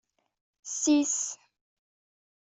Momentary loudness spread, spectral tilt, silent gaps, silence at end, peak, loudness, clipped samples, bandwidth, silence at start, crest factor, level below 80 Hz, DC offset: 21 LU; -1 dB/octave; none; 1.1 s; -14 dBFS; -27 LUFS; under 0.1%; 8.2 kHz; 0.65 s; 18 dB; -76 dBFS; under 0.1%